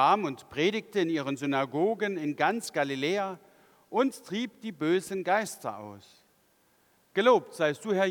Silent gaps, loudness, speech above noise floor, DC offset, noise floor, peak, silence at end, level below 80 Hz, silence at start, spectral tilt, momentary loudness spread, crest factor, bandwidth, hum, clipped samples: none; -29 LUFS; 39 dB; under 0.1%; -67 dBFS; -10 dBFS; 0 s; -78 dBFS; 0 s; -5 dB/octave; 11 LU; 20 dB; 19 kHz; none; under 0.1%